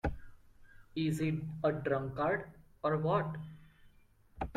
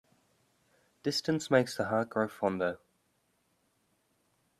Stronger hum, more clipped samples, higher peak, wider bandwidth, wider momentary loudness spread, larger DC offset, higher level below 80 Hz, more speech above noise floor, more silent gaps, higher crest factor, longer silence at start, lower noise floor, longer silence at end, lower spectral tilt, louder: neither; neither; second, -20 dBFS vs -12 dBFS; second, 13 kHz vs 14.5 kHz; first, 14 LU vs 8 LU; neither; first, -52 dBFS vs -74 dBFS; second, 30 dB vs 44 dB; neither; second, 18 dB vs 24 dB; second, 0.05 s vs 1.05 s; second, -64 dBFS vs -75 dBFS; second, 0 s vs 1.85 s; first, -7.5 dB/octave vs -5 dB/octave; second, -35 LUFS vs -31 LUFS